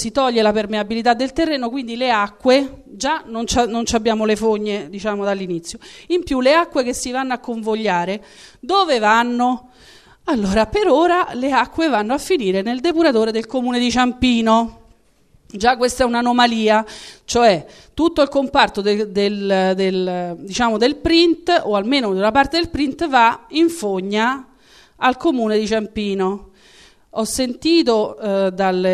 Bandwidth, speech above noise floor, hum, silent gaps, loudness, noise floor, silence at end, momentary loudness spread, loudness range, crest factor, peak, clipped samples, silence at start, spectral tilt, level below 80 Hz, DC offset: 13 kHz; 38 dB; none; none; -18 LUFS; -56 dBFS; 0 s; 9 LU; 3 LU; 18 dB; 0 dBFS; under 0.1%; 0 s; -4 dB/octave; -44 dBFS; under 0.1%